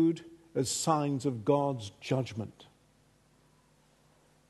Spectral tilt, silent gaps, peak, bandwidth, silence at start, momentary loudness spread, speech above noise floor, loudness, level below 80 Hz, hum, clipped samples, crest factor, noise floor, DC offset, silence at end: -5.5 dB/octave; none; -12 dBFS; 12.5 kHz; 0 s; 12 LU; 35 dB; -32 LUFS; -70 dBFS; none; under 0.1%; 22 dB; -66 dBFS; under 0.1%; 1.85 s